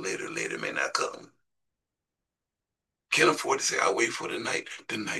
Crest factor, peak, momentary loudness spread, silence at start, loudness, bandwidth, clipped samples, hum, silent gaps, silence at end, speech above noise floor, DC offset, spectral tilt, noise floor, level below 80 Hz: 24 dB; -8 dBFS; 11 LU; 0 s; -28 LUFS; 12.5 kHz; under 0.1%; none; none; 0 s; 60 dB; under 0.1%; -2 dB/octave; -88 dBFS; -78 dBFS